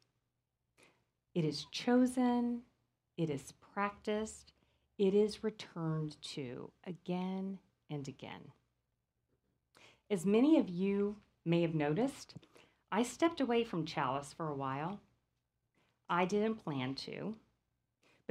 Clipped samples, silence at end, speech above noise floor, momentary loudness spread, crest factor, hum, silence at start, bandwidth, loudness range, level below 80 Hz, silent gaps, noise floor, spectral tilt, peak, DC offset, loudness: under 0.1%; 0.9 s; 50 dB; 16 LU; 20 dB; none; 1.35 s; 14 kHz; 8 LU; -72 dBFS; none; -86 dBFS; -6 dB/octave; -18 dBFS; under 0.1%; -36 LUFS